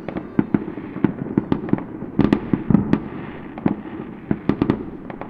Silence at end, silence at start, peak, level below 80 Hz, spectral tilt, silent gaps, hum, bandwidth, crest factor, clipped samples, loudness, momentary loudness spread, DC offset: 0 s; 0 s; 0 dBFS; -44 dBFS; -10 dB/octave; none; none; 5.4 kHz; 22 dB; under 0.1%; -23 LUFS; 13 LU; under 0.1%